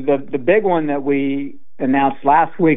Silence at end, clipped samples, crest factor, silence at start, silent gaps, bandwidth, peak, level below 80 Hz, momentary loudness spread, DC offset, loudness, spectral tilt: 0 s; under 0.1%; 14 dB; 0 s; none; 3.9 kHz; -2 dBFS; -64 dBFS; 9 LU; 4%; -17 LUFS; -10.5 dB/octave